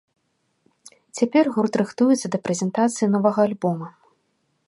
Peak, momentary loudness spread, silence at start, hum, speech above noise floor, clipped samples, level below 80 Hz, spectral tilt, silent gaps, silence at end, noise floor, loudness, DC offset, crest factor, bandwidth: -4 dBFS; 7 LU; 1.15 s; none; 50 dB; under 0.1%; -72 dBFS; -6 dB/octave; none; 0.8 s; -71 dBFS; -21 LUFS; under 0.1%; 18 dB; 11.5 kHz